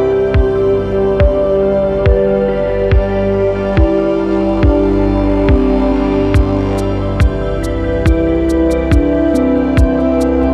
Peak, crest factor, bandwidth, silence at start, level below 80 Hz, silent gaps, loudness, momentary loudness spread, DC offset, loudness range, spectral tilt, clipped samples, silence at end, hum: 0 dBFS; 12 dB; 11.5 kHz; 0 s; -18 dBFS; none; -13 LUFS; 3 LU; under 0.1%; 1 LU; -8.5 dB/octave; under 0.1%; 0 s; 50 Hz at -25 dBFS